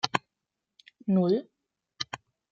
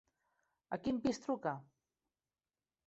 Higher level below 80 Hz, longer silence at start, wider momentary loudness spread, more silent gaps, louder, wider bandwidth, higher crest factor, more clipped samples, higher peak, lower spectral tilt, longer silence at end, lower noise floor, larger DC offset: about the same, -74 dBFS vs -72 dBFS; second, 0.05 s vs 0.7 s; first, 14 LU vs 9 LU; neither; first, -30 LUFS vs -40 LUFS; about the same, 7.8 kHz vs 8 kHz; first, 26 dB vs 20 dB; neither; first, -6 dBFS vs -24 dBFS; about the same, -6 dB/octave vs -5.5 dB/octave; second, 0.35 s vs 1.25 s; second, -86 dBFS vs under -90 dBFS; neither